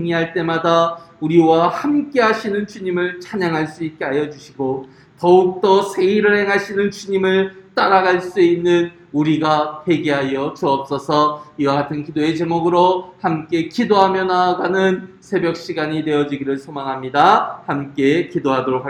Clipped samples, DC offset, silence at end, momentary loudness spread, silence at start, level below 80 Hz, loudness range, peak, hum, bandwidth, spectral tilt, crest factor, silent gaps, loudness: under 0.1%; under 0.1%; 0 s; 9 LU; 0 s; -58 dBFS; 3 LU; 0 dBFS; none; 11 kHz; -6 dB/octave; 18 dB; none; -17 LUFS